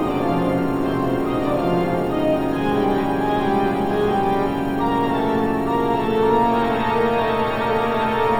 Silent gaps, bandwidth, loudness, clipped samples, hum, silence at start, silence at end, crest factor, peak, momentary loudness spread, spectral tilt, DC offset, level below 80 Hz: none; over 20 kHz; -20 LUFS; under 0.1%; none; 0 s; 0 s; 14 dB; -6 dBFS; 3 LU; -7.5 dB/octave; 1%; -40 dBFS